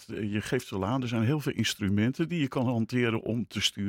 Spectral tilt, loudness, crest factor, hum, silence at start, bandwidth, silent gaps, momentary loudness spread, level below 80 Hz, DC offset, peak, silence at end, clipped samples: -5.5 dB/octave; -29 LUFS; 18 dB; none; 0 s; 16.5 kHz; none; 4 LU; -62 dBFS; under 0.1%; -12 dBFS; 0 s; under 0.1%